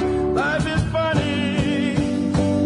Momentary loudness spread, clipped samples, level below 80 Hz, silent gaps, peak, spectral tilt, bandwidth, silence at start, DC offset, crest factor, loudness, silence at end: 1 LU; under 0.1%; -36 dBFS; none; -6 dBFS; -6.5 dB/octave; 11 kHz; 0 s; under 0.1%; 14 dB; -21 LUFS; 0 s